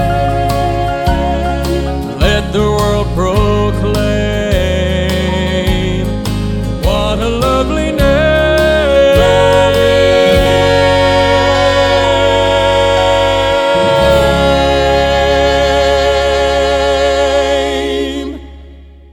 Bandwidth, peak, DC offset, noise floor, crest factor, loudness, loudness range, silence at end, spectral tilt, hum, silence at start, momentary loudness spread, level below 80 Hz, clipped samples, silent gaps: 18 kHz; 0 dBFS; under 0.1%; -35 dBFS; 12 dB; -11 LUFS; 5 LU; 0.3 s; -5.5 dB/octave; none; 0 s; 7 LU; -22 dBFS; under 0.1%; none